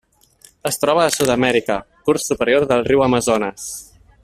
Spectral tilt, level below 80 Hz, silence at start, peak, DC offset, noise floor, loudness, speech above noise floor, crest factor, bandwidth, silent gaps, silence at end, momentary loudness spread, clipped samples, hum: -4 dB/octave; -48 dBFS; 0.65 s; -2 dBFS; under 0.1%; -51 dBFS; -17 LUFS; 34 dB; 16 dB; 16 kHz; none; 0.4 s; 11 LU; under 0.1%; none